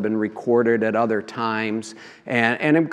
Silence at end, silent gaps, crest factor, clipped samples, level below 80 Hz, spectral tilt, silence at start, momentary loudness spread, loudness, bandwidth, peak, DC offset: 0 s; none; 20 dB; under 0.1%; -76 dBFS; -6.5 dB/octave; 0 s; 10 LU; -21 LUFS; 10.5 kHz; -2 dBFS; under 0.1%